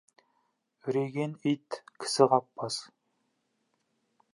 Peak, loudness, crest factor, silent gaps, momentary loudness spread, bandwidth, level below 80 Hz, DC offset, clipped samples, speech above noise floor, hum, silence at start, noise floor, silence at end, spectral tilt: -6 dBFS; -30 LUFS; 26 dB; none; 13 LU; 11.5 kHz; -86 dBFS; under 0.1%; under 0.1%; 48 dB; none; 0.85 s; -77 dBFS; 1.5 s; -5 dB/octave